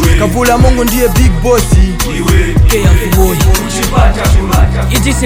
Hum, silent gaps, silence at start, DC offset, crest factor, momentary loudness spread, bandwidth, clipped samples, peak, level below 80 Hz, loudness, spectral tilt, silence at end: none; none; 0 s; under 0.1%; 8 dB; 3 LU; 16.5 kHz; 2%; 0 dBFS; -12 dBFS; -10 LUFS; -5 dB/octave; 0 s